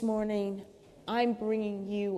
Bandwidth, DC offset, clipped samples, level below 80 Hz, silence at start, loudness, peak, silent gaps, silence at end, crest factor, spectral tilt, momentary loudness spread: 12 kHz; under 0.1%; under 0.1%; -64 dBFS; 0 s; -32 LUFS; -16 dBFS; none; 0 s; 16 dB; -7 dB/octave; 10 LU